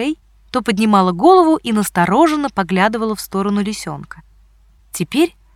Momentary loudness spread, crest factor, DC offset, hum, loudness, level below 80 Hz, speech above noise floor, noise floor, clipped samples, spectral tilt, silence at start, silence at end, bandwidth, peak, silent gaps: 15 LU; 14 dB; under 0.1%; none; -15 LUFS; -48 dBFS; 35 dB; -50 dBFS; under 0.1%; -5.5 dB/octave; 0 s; 0.25 s; 16.5 kHz; -2 dBFS; none